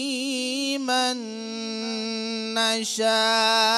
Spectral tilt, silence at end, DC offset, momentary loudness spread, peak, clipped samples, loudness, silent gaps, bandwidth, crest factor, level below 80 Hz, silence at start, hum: -1.5 dB/octave; 0 s; under 0.1%; 11 LU; -8 dBFS; under 0.1%; -24 LUFS; none; 16 kHz; 18 dB; -86 dBFS; 0 s; none